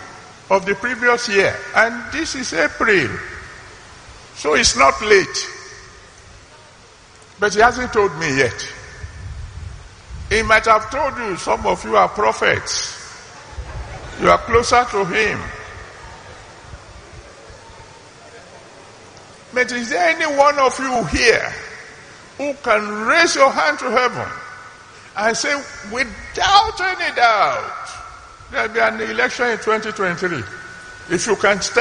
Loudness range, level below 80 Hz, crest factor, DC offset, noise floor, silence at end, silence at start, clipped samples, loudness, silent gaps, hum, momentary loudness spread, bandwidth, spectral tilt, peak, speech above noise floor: 4 LU; -42 dBFS; 20 dB; under 0.1%; -45 dBFS; 0 s; 0 s; under 0.1%; -17 LUFS; none; none; 22 LU; 10 kHz; -3 dB/octave; 0 dBFS; 28 dB